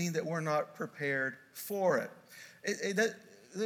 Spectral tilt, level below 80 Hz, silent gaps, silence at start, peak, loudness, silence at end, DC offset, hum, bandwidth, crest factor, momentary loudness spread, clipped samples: -4.5 dB/octave; -88 dBFS; none; 0 s; -16 dBFS; -34 LUFS; 0 s; under 0.1%; none; 19 kHz; 18 dB; 15 LU; under 0.1%